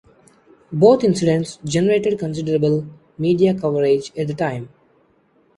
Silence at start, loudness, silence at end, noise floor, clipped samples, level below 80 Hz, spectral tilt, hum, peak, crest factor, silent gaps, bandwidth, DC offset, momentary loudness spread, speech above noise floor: 0.7 s; -18 LUFS; 0.9 s; -58 dBFS; under 0.1%; -56 dBFS; -6.5 dB/octave; none; -2 dBFS; 18 dB; none; 11.5 kHz; under 0.1%; 10 LU; 41 dB